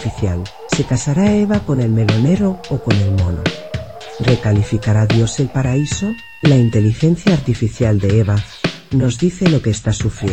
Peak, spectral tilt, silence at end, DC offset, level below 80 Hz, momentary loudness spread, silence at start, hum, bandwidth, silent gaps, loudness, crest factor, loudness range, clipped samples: 0 dBFS; -6.5 dB/octave; 0 s; 0.7%; -34 dBFS; 7 LU; 0 s; none; 8.8 kHz; none; -16 LUFS; 14 dB; 2 LU; under 0.1%